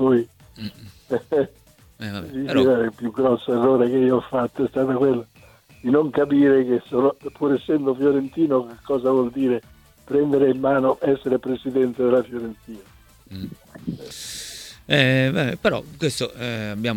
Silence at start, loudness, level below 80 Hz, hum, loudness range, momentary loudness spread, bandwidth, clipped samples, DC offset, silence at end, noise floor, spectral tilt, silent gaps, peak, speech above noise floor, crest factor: 0 s; -21 LUFS; -54 dBFS; none; 4 LU; 17 LU; 17 kHz; under 0.1%; under 0.1%; 0 s; -51 dBFS; -6 dB/octave; none; -2 dBFS; 30 dB; 20 dB